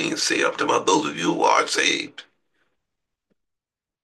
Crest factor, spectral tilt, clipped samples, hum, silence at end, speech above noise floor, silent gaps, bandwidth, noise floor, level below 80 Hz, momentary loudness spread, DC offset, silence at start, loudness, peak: 20 dB; -2 dB/octave; under 0.1%; none; 1.8 s; 65 dB; none; 12.5 kHz; -86 dBFS; -72 dBFS; 6 LU; under 0.1%; 0 s; -20 LUFS; -4 dBFS